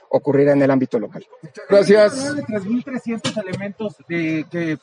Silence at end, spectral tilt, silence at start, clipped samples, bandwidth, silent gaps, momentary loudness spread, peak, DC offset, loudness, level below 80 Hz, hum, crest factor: 0.05 s; -6 dB/octave; 0.1 s; under 0.1%; 10.5 kHz; none; 14 LU; -2 dBFS; under 0.1%; -18 LUFS; -66 dBFS; none; 16 dB